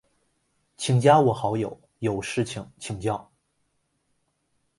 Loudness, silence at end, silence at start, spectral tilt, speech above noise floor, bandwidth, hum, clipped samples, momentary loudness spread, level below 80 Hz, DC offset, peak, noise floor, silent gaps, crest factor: -24 LUFS; 1.55 s; 0.8 s; -6 dB/octave; 50 dB; 11.5 kHz; none; under 0.1%; 16 LU; -58 dBFS; under 0.1%; -4 dBFS; -73 dBFS; none; 22 dB